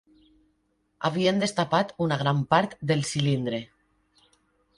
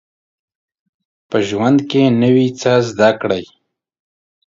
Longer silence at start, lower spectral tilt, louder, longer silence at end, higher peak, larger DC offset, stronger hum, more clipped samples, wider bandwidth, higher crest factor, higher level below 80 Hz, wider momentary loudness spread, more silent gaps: second, 1 s vs 1.3 s; about the same, -5.5 dB/octave vs -6.5 dB/octave; second, -25 LUFS vs -15 LUFS; about the same, 1.15 s vs 1.05 s; second, -6 dBFS vs 0 dBFS; neither; neither; neither; first, 11.5 kHz vs 7.6 kHz; about the same, 20 dB vs 16 dB; second, -62 dBFS vs -56 dBFS; about the same, 6 LU vs 8 LU; neither